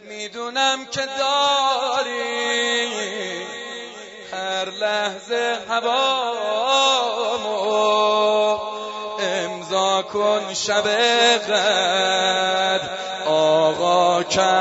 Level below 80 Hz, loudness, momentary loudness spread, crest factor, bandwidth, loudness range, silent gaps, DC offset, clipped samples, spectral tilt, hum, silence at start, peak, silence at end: -64 dBFS; -20 LUFS; 11 LU; 16 dB; 8 kHz; 6 LU; none; under 0.1%; under 0.1%; -1.5 dB/octave; none; 0 s; -4 dBFS; 0 s